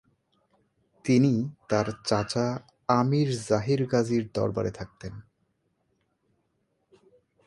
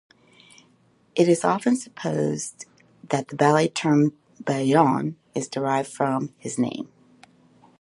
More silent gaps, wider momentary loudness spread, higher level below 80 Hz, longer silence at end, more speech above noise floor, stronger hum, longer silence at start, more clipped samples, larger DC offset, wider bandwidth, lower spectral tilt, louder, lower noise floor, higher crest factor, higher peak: neither; about the same, 13 LU vs 13 LU; first, -58 dBFS vs -70 dBFS; first, 2.25 s vs 0.95 s; first, 48 dB vs 38 dB; neither; about the same, 1.05 s vs 1.15 s; neither; neither; about the same, 11.5 kHz vs 11.5 kHz; about the same, -6.5 dB/octave vs -5.5 dB/octave; second, -27 LUFS vs -23 LUFS; first, -74 dBFS vs -61 dBFS; about the same, 22 dB vs 22 dB; second, -8 dBFS vs -2 dBFS